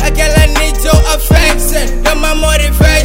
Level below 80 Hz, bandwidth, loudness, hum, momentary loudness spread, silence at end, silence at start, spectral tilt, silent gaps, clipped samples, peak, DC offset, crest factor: -10 dBFS; 16.5 kHz; -10 LUFS; none; 4 LU; 0 s; 0 s; -4 dB/octave; none; 1%; 0 dBFS; under 0.1%; 8 dB